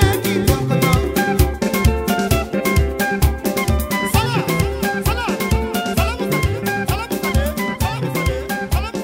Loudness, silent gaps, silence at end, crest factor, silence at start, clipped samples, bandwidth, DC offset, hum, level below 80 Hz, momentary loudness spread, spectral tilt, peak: -19 LUFS; none; 0 s; 18 dB; 0 s; under 0.1%; 16.5 kHz; under 0.1%; none; -24 dBFS; 4 LU; -5.5 dB/octave; 0 dBFS